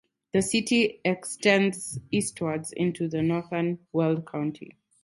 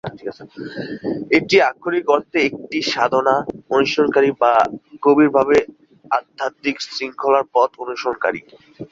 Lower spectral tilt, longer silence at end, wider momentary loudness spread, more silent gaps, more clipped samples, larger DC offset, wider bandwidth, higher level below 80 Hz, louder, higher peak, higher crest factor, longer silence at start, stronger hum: about the same, -4.5 dB/octave vs -5 dB/octave; first, 0.3 s vs 0.05 s; second, 9 LU vs 15 LU; neither; neither; neither; first, 12 kHz vs 7.6 kHz; about the same, -62 dBFS vs -58 dBFS; second, -27 LUFS vs -18 LUFS; second, -6 dBFS vs -2 dBFS; about the same, 22 dB vs 18 dB; first, 0.35 s vs 0.05 s; neither